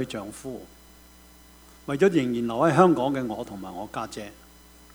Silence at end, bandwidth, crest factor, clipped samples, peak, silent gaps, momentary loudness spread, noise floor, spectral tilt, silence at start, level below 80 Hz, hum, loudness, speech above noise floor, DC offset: 0.6 s; over 20 kHz; 22 dB; under 0.1%; -4 dBFS; none; 20 LU; -51 dBFS; -6.5 dB/octave; 0 s; -56 dBFS; none; -24 LUFS; 27 dB; under 0.1%